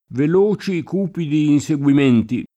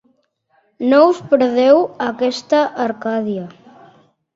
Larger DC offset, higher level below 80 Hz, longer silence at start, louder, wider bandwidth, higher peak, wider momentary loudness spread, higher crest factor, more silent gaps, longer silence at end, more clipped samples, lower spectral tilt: neither; first, -56 dBFS vs -64 dBFS; second, 0.1 s vs 0.8 s; about the same, -17 LUFS vs -16 LUFS; first, 9.2 kHz vs 7.8 kHz; second, -4 dBFS vs 0 dBFS; second, 7 LU vs 11 LU; about the same, 12 dB vs 16 dB; neither; second, 0.1 s vs 0.85 s; neither; first, -7.5 dB/octave vs -5.5 dB/octave